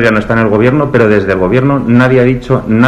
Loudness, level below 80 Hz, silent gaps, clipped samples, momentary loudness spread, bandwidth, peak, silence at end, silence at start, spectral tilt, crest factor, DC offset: -9 LUFS; -32 dBFS; none; 1%; 3 LU; 9.6 kHz; 0 dBFS; 0 s; 0 s; -8.5 dB/octave; 8 dB; under 0.1%